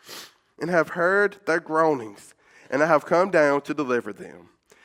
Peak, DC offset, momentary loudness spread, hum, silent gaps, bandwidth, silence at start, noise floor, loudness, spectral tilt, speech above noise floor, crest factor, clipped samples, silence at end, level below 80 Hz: -4 dBFS; under 0.1%; 21 LU; none; none; 16 kHz; 0.1 s; -44 dBFS; -22 LUFS; -5.5 dB/octave; 21 dB; 20 dB; under 0.1%; 0.45 s; -74 dBFS